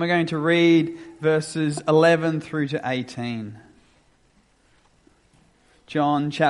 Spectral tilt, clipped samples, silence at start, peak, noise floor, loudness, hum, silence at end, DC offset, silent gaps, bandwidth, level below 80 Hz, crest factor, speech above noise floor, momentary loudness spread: -6 dB/octave; under 0.1%; 0 s; -4 dBFS; -61 dBFS; -22 LUFS; none; 0 s; under 0.1%; none; 11.5 kHz; -64 dBFS; 18 dB; 39 dB; 13 LU